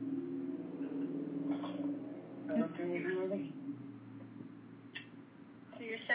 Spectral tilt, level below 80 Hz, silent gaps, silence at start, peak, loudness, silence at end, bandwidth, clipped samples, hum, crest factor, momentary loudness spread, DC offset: -5 dB/octave; -88 dBFS; none; 0 s; -22 dBFS; -41 LUFS; 0 s; 4 kHz; under 0.1%; none; 18 dB; 16 LU; under 0.1%